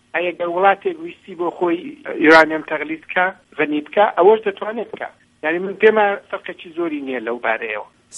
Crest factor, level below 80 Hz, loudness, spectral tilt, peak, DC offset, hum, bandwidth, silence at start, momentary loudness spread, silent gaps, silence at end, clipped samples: 18 dB; -64 dBFS; -18 LUFS; -5 dB/octave; 0 dBFS; under 0.1%; none; 10.5 kHz; 0.15 s; 16 LU; none; 0 s; under 0.1%